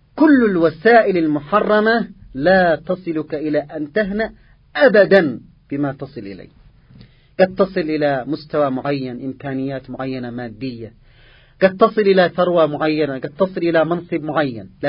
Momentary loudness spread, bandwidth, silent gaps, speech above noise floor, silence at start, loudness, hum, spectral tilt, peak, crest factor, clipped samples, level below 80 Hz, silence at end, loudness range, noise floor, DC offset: 15 LU; 5.4 kHz; none; 31 dB; 0.15 s; -17 LUFS; none; -9.5 dB/octave; 0 dBFS; 18 dB; under 0.1%; -50 dBFS; 0 s; 6 LU; -48 dBFS; under 0.1%